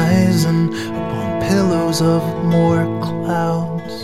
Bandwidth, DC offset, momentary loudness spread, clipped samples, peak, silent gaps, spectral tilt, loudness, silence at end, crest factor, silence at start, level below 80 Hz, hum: 14.5 kHz; 0.5%; 7 LU; under 0.1%; -2 dBFS; none; -6.5 dB/octave; -17 LUFS; 0 s; 14 dB; 0 s; -46 dBFS; none